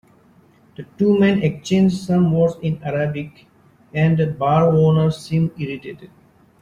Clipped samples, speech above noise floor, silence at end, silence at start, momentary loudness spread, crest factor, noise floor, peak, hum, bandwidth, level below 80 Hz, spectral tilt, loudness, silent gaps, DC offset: under 0.1%; 35 dB; 0.55 s; 0.8 s; 15 LU; 14 dB; -52 dBFS; -4 dBFS; none; 10.5 kHz; -52 dBFS; -8 dB/octave; -18 LUFS; none; under 0.1%